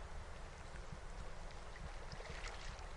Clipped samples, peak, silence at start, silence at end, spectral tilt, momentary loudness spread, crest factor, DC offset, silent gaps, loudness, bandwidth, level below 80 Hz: under 0.1%; -34 dBFS; 0 s; 0 s; -4 dB/octave; 5 LU; 14 dB; under 0.1%; none; -52 LUFS; 11.5 kHz; -52 dBFS